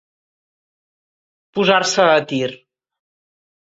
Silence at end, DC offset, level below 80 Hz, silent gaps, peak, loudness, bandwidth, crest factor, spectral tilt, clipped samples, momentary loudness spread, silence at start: 1.15 s; under 0.1%; -64 dBFS; none; 0 dBFS; -16 LUFS; 8 kHz; 20 dB; -3.5 dB/octave; under 0.1%; 12 LU; 1.55 s